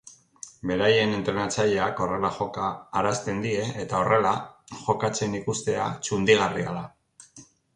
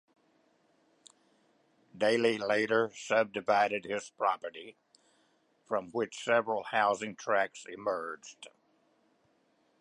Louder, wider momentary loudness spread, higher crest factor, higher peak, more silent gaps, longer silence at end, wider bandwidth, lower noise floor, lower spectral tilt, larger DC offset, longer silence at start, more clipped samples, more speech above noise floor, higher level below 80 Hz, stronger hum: first, -25 LUFS vs -31 LUFS; about the same, 12 LU vs 14 LU; about the same, 20 dB vs 20 dB; first, -6 dBFS vs -12 dBFS; neither; second, 0.3 s vs 1.35 s; about the same, 11 kHz vs 11.5 kHz; second, -53 dBFS vs -71 dBFS; about the same, -4.5 dB/octave vs -4 dB/octave; neither; second, 0.05 s vs 1.95 s; neither; second, 28 dB vs 40 dB; first, -56 dBFS vs -80 dBFS; neither